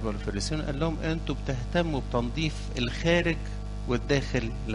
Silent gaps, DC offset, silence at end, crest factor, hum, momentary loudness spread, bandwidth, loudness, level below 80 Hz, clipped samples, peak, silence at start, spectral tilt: none; under 0.1%; 0 s; 20 dB; 50 Hz at -35 dBFS; 7 LU; 11 kHz; -29 LUFS; -36 dBFS; under 0.1%; -8 dBFS; 0 s; -5.5 dB/octave